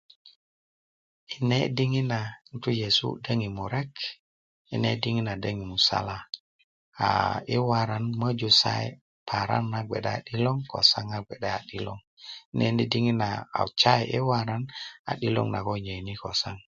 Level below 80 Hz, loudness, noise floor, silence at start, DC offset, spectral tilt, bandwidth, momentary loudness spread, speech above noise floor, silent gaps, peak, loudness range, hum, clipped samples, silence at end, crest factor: -56 dBFS; -27 LUFS; under -90 dBFS; 0.25 s; under 0.1%; -5.5 dB/octave; 7.6 kHz; 14 LU; over 63 dB; 0.36-1.27 s, 4.19-4.65 s, 6.40-6.92 s, 9.01-9.26 s, 12.07-12.17 s, 12.45-12.52 s, 14.99-15.05 s; -4 dBFS; 4 LU; none; under 0.1%; 0.15 s; 24 dB